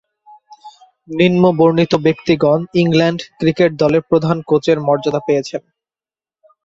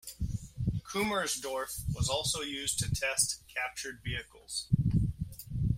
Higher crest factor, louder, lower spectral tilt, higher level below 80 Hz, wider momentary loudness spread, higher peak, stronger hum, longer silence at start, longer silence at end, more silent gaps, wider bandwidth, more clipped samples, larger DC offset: second, 14 dB vs 20 dB; first, -14 LUFS vs -33 LUFS; first, -7 dB/octave vs -3.5 dB/octave; second, -52 dBFS vs -44 dBFS; about the same, 7 LU vs 9 LU; first, -2 dBFS vs -14 dBFS; neither; first, 0.5 s vs 0.05 s; first, 1.05 s vs 0 s; neither; second, 7.8 kHz vs 16 kHz; neither; neither